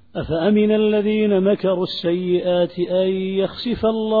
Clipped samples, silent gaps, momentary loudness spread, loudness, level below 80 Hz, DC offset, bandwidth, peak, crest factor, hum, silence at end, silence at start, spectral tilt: under 0.1%; none; 5 LU; -19 LUFS; -48 dBFS; 0.3%; 4.9 kHz; -6 dBFS; 12 dB; none; 0 s; 0.15 s; -9 dB/octave